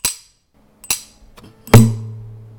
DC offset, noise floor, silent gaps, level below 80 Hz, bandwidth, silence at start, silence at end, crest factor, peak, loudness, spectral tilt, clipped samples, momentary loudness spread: under 0.1%; -55 dBFS; none; -36 dBFS; 19 kHz; 0.05 s; 0.3 s; 18 dB; 0 dBFS; -15 LUFS; -5 dB/octave; 0.3%; 22 LU